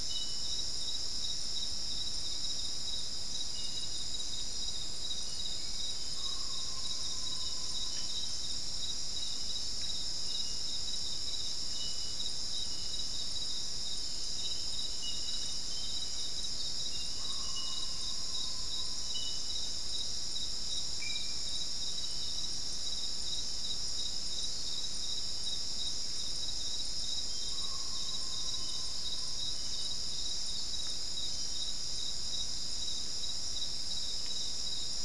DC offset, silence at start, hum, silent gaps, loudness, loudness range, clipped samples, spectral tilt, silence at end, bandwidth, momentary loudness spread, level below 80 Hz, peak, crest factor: 2%; 0 s; none; none; -35 LUFS; 1 LU; under 0.1%; -0.5 dB/octave; 0 s; 12 kHz; 1 LU; -52 dBFS; -22 dBFS; 14 dB